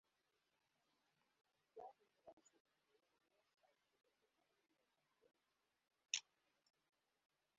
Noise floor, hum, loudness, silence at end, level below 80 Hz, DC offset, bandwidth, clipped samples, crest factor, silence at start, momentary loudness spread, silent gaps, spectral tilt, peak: -89 dBFS; none; -47 LUFS; 1.35 s; under -90 dBFS; under 0.1%; 6.2 kHz; under 0.1%; 40 dB; 1.75 s; 22 LU; 2.33-2.37 s, 2.60-2.65 s; 3.5 dB/octave; -22 dBFS